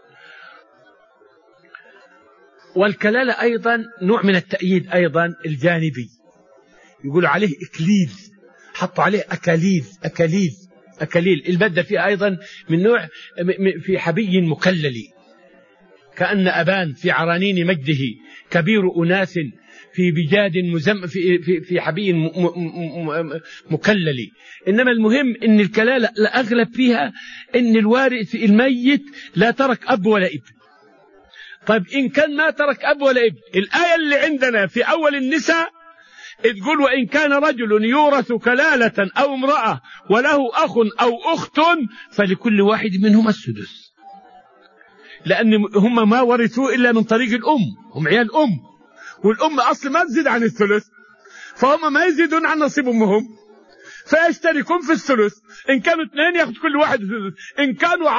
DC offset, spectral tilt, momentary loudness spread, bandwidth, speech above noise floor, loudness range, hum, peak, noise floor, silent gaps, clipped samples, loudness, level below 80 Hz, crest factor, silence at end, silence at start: under 0.1%; -6 dB/octave; 9 LU; 7.4 kHz; 35 dB; 4 LU; none; -2 dBFS; -53 dBFS; none; under 0.1%; -17 LUFS; -64 dBFS; 18 dB; 0 s; 0.4 s